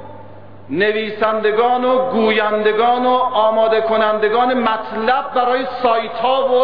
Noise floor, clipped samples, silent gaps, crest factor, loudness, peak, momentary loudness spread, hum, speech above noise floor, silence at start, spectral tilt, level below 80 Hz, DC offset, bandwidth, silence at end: -38 dBFS; under 0.1%; none; 12 dB; -16 LUFS; -4 dBFS; 3 LU; none; 23 dB; 0 s; -7.5 dB/octave; -60 dBFS; 1%; 5.2 kHz; 0 s